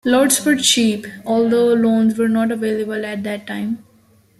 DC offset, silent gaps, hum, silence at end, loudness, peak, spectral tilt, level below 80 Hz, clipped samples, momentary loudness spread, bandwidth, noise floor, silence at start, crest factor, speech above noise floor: under 0.1%; none; none; 0.6 s; -17 LUFS; -2 dBFS; -3.5 dB/octave; -60 dBFS; under 0.1%; 11 LU; 15 kHz; -53 dBFS; 0.05 s; 16 dB; 37 dB